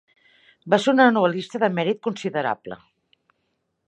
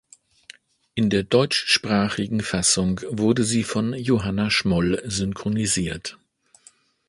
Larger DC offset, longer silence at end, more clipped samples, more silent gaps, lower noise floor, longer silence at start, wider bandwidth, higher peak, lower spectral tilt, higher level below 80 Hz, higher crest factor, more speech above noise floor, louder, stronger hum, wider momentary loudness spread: neither; first, 1.15 s vs 0.95 s; neither; neither; first, -74 dBFS vs -56 dBFS; second, 0.65 s vs 0.95 s; second, 9.8 kHz vs 11.5 kHz; about the same, -2 dBFS vs -4 dBFS; first, -5.5 dB/octave vs -4 dB/octave; second, -72 dBFS vs -46 dBFS; about the same, 22 dB vs 20 dB; first, 53 dB vs 34 dB; about the same, -21 LUFS vs -22 LUFS; neither; first, 14 LU vs 6 LU